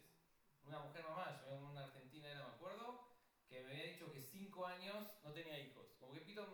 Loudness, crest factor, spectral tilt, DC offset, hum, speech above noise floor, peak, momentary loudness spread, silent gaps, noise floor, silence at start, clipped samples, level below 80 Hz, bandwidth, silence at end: -54 LUFS; 18 dB; -5 dB/octave; under 0.1%; none; 23 dB; -38 dBFS; 9 LU; none; -77 dBFS; 0 s; under 0.1%; -90 dBFS; over 20 kHz; 0 s